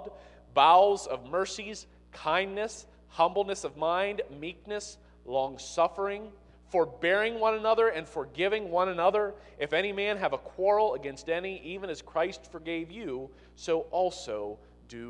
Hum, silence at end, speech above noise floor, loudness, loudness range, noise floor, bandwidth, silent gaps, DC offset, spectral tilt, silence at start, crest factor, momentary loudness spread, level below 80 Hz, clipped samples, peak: 60 Hz at -60 dBFS; 0 s; 19 dB; -29 LUFS; 6 LU; -48 dBFS; 11 kHz; none; under 0.1%; -3.5 dB/octave; 0 s; 22 dB; 15 LU; -58 dBFS; under 0.1%; -8 dBFS